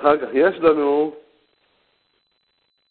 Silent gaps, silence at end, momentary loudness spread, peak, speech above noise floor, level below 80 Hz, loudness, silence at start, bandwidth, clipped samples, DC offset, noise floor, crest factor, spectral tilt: none; 1.7 s; 6 LU; -2 dBFS; 51 dB; -60 dBFS; -18 LUFS; 0 s; 4.4 kHz; under 0.1%; under 0.1%; -68 dBFS; 20 dB; -10 dB/octave